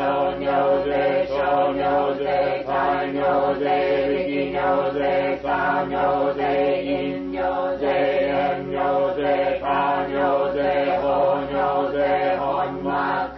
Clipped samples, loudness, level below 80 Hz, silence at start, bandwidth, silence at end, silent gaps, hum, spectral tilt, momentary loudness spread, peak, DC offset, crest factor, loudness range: under 0.1%; -21 LUFS; -48 dBFS; 0 s; 5.8 kHz; 0 s; none; none; -8 dB/octave; 3 LU; -10 dBFS; under 0.1%; 12 dB; 1 LU